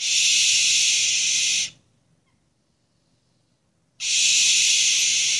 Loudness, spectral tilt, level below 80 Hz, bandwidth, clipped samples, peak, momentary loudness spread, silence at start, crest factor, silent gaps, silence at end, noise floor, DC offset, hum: -17 LUFS; 4.5 dB/octave; -70 dBFS; 12 kHz; under 0.1%; -6 dBFS; 7 LU; 0 s; 16 dB; none; 0 s; -68 dBFS; under 0.1%; none